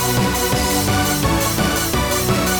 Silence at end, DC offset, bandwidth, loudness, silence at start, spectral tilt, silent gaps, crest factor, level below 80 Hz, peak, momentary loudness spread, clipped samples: 0 s; under 0.1%; 19.5 kHz; -17 LUFS; 0 s; -3.5 dB/octave; none; 12 dB; -30 dBFS; -6 dBFS; 1 LU; under 0.1%